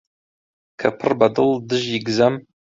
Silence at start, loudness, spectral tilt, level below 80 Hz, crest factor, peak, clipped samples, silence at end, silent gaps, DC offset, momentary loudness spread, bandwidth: 0.8 s; -19 LUFS; -5.5 dB/octave; -58 dBFS; 18 dB; -2 dBFS; under 0.1%; 0.25 s; none; under 0.1%; 6 LU; 7.8 kHz